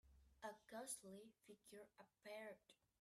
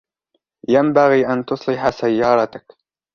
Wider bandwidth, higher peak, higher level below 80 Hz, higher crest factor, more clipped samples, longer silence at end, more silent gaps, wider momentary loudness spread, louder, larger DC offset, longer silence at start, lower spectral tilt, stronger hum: first, 15.5 kHz vs 7.2 kHz; second, -38 dBFS vs -2 dBFS; second, -82 dBFS vs -54 dBFS; first, 22 dB vs 16 dB; neither; second, 0.25 s vs 0.55 s; neither; first, 14 LU vs 9 LU; second, -58 LUFS vs -17 LUFS; neither; second, 0.05 s vs 0.7 s; second, -2.5 dB/octave vs -7 dB/octave; neither